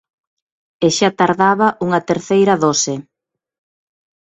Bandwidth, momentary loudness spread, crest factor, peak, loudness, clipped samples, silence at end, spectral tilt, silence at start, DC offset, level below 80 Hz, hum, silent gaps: 8.4 kHz; 6 LU; 18 dB; 0 dBFS; -15 LUFS; under 0.1%; 1.3 s; -4 dB/octave; 0.8 s; under 0.1%; -58 dBFS; none; none